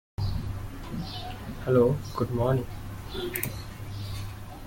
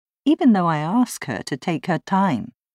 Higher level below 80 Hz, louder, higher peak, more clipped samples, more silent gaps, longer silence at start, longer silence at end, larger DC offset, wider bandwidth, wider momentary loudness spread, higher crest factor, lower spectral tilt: first, -42 dBFS vs -66 dBFS; second, -30 LUFS vs -21 LUFS; second, -10 dBFS vs -6 dBFS; neither; neither; about the same, 0.2 s vs 0.25 s; second, 0 s vs 0.25 s; neither; first, 17 kHz vs 15 kHz; first, 15 LU vs 10 LU; first, 20 dB vs 14 dB; about the same, -6.5 dB/octave vs -6 dB/octave